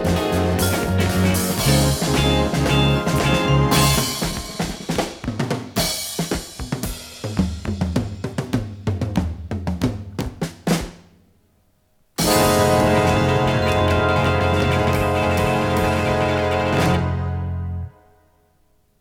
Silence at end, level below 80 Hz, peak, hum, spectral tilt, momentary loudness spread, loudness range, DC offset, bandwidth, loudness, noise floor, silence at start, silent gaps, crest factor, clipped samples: 1.1 s; -34 dBFS; -4 dBFS; none; -5 dB/octave; 11 LU; 8 LU; under 0.1%; 19.5 kHz; -20 LUFS; -60 dBFS; 0 s; none; 16 dB; under 0.1%